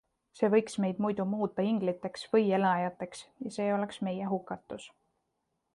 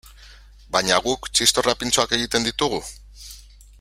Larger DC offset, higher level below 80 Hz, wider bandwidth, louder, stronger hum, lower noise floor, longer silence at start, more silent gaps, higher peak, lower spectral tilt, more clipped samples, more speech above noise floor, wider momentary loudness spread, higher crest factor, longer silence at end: neither; second, -72 dBFS vs -44 dBFS; second, 11.5 kHz vs 16 kHz; second, -31 LUFS vs -20 LUFS; second, none vs 50 Hz at -45 dBFS; first, -81 dBFS vs -46 dBFS; first, 0.35 s vs 0.05 s; neither; second, -14 dBFS vs 0 dBFS; first, -6.5 dB/octave vs -1.5 dB/octave; neither; first, 50 dB vs 24 dB; second, 14 LU vs 23 LU; about the same, 18 dB vs 22 dB; first, 0.85 s vs 0.4 s